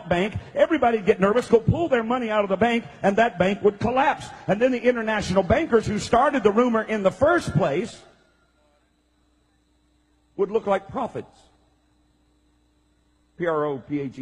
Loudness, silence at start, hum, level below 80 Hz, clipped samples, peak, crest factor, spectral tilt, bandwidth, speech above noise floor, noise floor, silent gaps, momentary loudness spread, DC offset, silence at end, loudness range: -22 LUFS; 0 s; none; -48 dBFS; under 0.1%; -4 dBFS; 18 dB; -6.5 dB/octave; 11.5 kHz; 43 dB; -65 dBFS; none; 9 LU; under 0.1%; 0 s; 10 LU